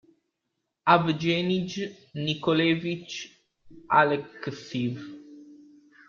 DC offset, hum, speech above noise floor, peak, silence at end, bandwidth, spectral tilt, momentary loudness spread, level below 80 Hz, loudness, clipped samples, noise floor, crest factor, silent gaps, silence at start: under 0.1%; none; 55 dB; -6 dBFS; 0.5 s; 7.2 kHz; -6 dB/octave; 16 LU; -66 dBFS; -26 LUFS; under 0.1%; -81 dBFS; 22 dB; none; 0.85 s